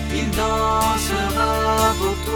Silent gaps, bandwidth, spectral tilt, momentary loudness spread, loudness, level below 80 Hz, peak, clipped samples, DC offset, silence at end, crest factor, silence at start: none; 19.5 kHz; -4 dB/octave; 3 LU; -19 LUFS; -28 dBFS; -6 dBFS; under 0.1%; under 0.1%; 0 s; 14 dB; 0 s